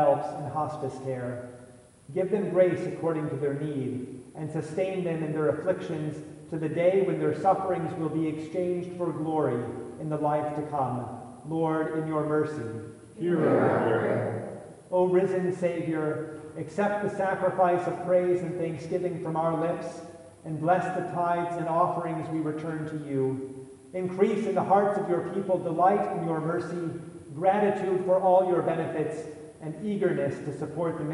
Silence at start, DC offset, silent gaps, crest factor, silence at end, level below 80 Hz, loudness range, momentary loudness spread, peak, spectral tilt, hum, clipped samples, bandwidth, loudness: 0 s; under 0.1%; none; 18 dB; 0 s; -70 dBFS; 3 LU; 13 LU; -10 dBFS; -8 dB/octave; none; under 0.1%; 11.5 kHz; -28 LUFS